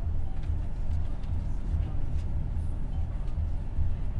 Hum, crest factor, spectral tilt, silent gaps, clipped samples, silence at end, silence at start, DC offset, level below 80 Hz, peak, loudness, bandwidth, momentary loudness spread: none; 12 dB; -9 dB/octave; none; under 0.1%; 0 s; 0 s; under 0.1%; -30 dBFS; -16 dBFS; -34 LUFS; 3.9 kHz; 2 LU